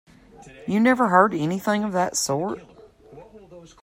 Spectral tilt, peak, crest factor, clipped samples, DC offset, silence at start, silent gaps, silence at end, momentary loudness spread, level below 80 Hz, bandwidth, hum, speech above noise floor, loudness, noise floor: -4.5 dB/octave; -4 dBFS; 20 dB; under 0.1%; under 0.1%; 0.45 s; none; 0.15 s; 13 LU; -60 dBFS; 16 kHz; none; 26 dB; -21 LUFS; -47 dBFS